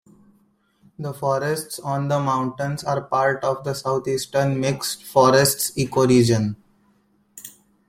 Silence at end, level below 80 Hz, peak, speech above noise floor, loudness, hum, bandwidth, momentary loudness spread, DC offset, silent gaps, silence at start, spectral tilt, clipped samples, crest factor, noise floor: 0.4 s; -56 dBFS; -2 dBFS; 41 dB; -21 LUFS; none; 16 kHz; 16 LU; under 0.1%; none; 1 s; -5 dB/octave; under 0.1%; 20 dB; -62 dBFS